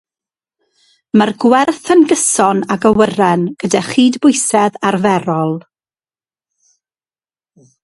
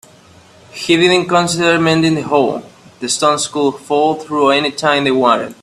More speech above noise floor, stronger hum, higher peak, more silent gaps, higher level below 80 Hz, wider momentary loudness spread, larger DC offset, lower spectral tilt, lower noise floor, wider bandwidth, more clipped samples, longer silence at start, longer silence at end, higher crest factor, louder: first, over 78 dB vs 30 dB; neither; about the same, 0 dBFS vs 0 dBFS; neither; about the same, -54 dBFS vs -54 dBFS; about the same, 6 LU vs 8 LU; neither; about the same, -4.5 dB/octave vs -4 dB/octave; first, under -90 dBFS vs -44 dBFS; second, 11.5 kHz vs 13.5 kHz; neither; first, 1.15 s vs 0.75 s; first, 2.25 s vs 0.1 s; about the same, 14 dB vs 14 dB; about the same, -13 LUFS vs -14 LUFS